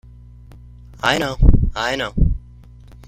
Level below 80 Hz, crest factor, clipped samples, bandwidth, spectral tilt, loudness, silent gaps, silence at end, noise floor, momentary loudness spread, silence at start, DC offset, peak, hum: -20 dBFS; 18 dB; under 0.1%; 13.5 kHz; -5.5 dB/octave; -19 LUFS; none; 0.7 s; -42 dBFS; 5 LU; 0.55 s; under 0.1%; 0 dBFS; 60 Hz at -35 dBFS